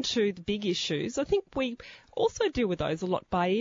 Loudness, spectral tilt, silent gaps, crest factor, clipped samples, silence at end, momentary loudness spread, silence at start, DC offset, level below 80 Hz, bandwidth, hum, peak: -30 LUFS; -4.5 dB/octave; none; 14 dB; under 0.1%; 0 s; 5 LU; 0 s; under 0.1%; -52 dBFS; 7.6 kHz; none; -14 dBFS